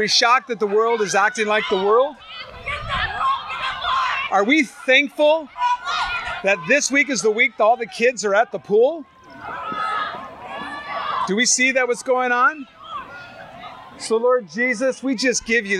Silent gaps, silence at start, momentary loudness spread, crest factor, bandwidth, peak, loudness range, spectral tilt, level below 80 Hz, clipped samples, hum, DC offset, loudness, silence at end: none; 0 s; 17 LU; 18 dB; 13 kHz; -2 dBFS; 4 LU; -2 dB/octave; -50 dBFS; under 0.1%; none; under 0.1%; -19 LUFS; 0 s